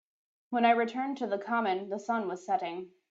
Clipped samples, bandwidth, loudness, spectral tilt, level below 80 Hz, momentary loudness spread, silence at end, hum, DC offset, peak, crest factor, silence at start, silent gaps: under 0.1%; 7.8 kHz; -31 LUFS; -5.5 dB/octave; -80 dBFS; 9 LU; 0.25 s; none; under 0.1%; -12 dBFS; 20 dB; 0.5 s; none